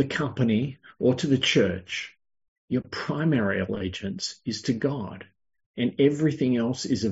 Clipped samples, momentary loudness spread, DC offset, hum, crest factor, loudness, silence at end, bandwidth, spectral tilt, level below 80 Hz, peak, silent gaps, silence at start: under 0.1%; 11 LU; under 0.1%; none; 18 dB; -26 LUFS; 0 s; 8 kHz; -5 dB/octave; -60 dBFS; -8 dBFS; 2.48-2.68 s, 5.66-5.74 s; 0 s